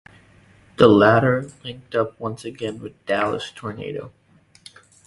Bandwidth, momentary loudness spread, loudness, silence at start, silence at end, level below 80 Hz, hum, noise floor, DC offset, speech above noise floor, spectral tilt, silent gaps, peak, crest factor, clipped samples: 11.5 kHz; 20 LU; -20 LUFS; 0.8 s; 1 s; -54 dBFS; none; -52 dBFS; under 0.1%; 32 dB; -6.5 dB/octave; none; 0 dBFS; 22 dB; under 0.1%